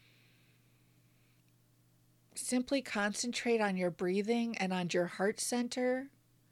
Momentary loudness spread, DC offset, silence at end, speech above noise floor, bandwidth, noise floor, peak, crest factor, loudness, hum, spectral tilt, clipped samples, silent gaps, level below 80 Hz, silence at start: 4 LU; under 0.1%; 0.45 s; 35 dB; 15.5 kHz; -69 dBFS; -20 dBFS; 16 dB; -34 LUFS; none; -4 dB/octave; under 0.1%; none; -76 dBFS; 2.35 s